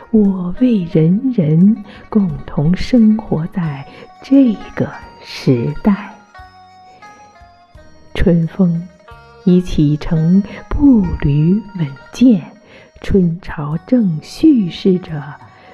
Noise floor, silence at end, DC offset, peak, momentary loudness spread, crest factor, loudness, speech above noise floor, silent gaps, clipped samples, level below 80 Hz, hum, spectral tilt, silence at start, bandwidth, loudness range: -43 dBFS; 0.25 s; under 0.1%; -2 dBFS; 12 LU; 14 dB; -15 LUFS; 30 dB; none; under 0.1%; -32 dBFS; none; -8.5 dB/octave; 0 s; 10.5 kHz; 6 LU